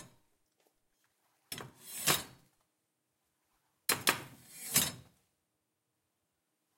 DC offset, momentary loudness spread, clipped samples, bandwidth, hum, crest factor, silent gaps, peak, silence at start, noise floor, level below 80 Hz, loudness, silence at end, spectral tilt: under 0.1%; 18 LU; under 0.1%; 16.5 kHz; none; 32 dB; none; -10 dBFS; 0 s; -84 dBFS; -72 dBFS; -32 LUFS; 1.75 s; -1 dB/octave